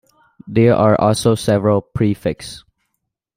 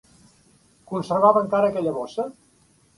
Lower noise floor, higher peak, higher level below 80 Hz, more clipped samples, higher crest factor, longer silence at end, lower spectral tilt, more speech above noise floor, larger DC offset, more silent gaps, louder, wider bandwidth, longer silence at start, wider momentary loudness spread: first, -75 dBFS vs -59 dBFS; about the same, -2 dBFS vs -2 dBFS; first, -46 dBFS vs -64 dBFS; neither; second, 14 dB vs 22 dB; first, 0.8 s vs 0.65 s; about the same, -6.5 dB/octave vs -7 dB/octave; first, 60 dB vs 38 dB; neither; neither; first, -16 LUFS vs -22 LUFS; first, 16 kHz vs 11.5 kHz; second, 0.45 s vs 0.9 s; second, 11 LU vs 14 LU